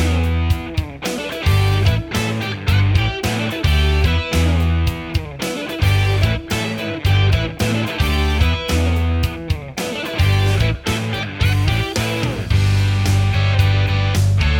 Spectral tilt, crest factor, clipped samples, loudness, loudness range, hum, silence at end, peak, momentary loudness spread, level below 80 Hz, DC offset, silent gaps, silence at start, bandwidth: -5.5 dB/octave; 14 dB; under 0.1%; -18 LUFS; 1 LU; none; 0 s; -2 dBFS; 7 LU; -24 dBFS; under 0.1%; none; 0 s; 18 kHz